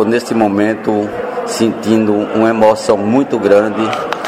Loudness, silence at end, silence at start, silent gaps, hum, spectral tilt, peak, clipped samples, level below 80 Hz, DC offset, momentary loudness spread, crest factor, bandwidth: -13 LUFS; 0 s; 0 s; none; none; -5.5 dB/octave; 0 dBFS; under 0.1%; -52 dBFS; under 0.1%; 6 LU; 12 dB; 15.5 kHz